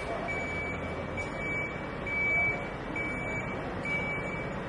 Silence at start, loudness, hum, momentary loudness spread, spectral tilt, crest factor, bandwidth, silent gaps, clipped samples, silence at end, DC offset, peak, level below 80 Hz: 0 s; -32 LUFS; none; 8 LU; -6 dB/octave; 14 dB; 11.5 kHz; none; under 0.1%; 0 s; under 0.1%; -18 dBFS; -48 dBFS